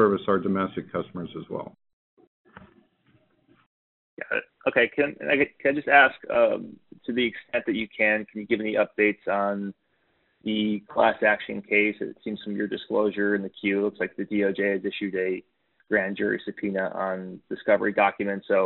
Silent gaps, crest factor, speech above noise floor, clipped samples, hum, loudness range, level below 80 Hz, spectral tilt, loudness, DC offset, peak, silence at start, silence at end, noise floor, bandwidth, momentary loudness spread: 1.93-2.17 s, 2.27-2.45 s, 3.66-4.17 s; 24 dB; 44 dB; under 0.1%; none; 9 LU; -66 dBFS; -3 dB/octave; -25 LUFS; under 0.1%; -2 dBFS; 0 s; 0 s; -69 dBFS; 4.2 kHz; 13 LU